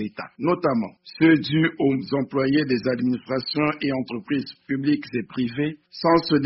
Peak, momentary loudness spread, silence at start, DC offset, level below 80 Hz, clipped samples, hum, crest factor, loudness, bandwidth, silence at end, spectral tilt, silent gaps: -6 dBFS; 9 LU; 0 s; under 0.1%; -60 dBFS; under 0.1%; none; 16 dB; -23 LUFS; 6 kHz; 0 s; -5 dB/octave; none